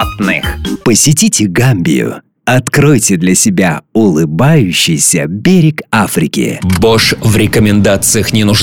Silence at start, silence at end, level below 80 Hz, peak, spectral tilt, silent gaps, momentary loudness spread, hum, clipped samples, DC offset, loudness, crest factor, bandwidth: 0 s; 0 s; -32 dBFS; 0 dBFS; -4.5 dB/octave; none; 5 LU; none; under 0.1%; 0.6%; -9 LUFS; 10 dB; 19.5 kHz